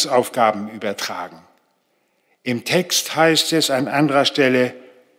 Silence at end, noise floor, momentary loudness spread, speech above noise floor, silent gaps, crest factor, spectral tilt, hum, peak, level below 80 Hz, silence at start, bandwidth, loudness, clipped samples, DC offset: 0.35 s; -66 dBFS; 11 LU; 47 dB; none; 16 dB; -3.5 dB/octave; none; -4 dBFS; -70 dBFS; 0 s; 16.5 kHz; -18 LUFS; under 0.1%; under 0.1%